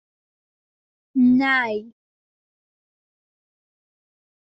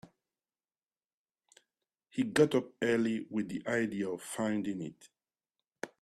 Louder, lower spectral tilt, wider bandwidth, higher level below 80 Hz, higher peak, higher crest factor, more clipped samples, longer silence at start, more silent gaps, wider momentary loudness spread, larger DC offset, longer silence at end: first, -19 LUFS vs -33 LUFS; second, -2.5 dB/octave vs -5.5 dB/octave; second, 5.8 kHz vs 13.5 kHz; first, -66 dBFS vs -74 dBFS; about the same, -10 dBFS vs -12 dBFS; second, 16 dB vs 24 dB; neither; first, 1.15 s vs 0.05 s; second, none vs 1.06-1.25 s; about the same, 12 LU vs 14 LU; neither; first, 2.7 s vs 0.15 s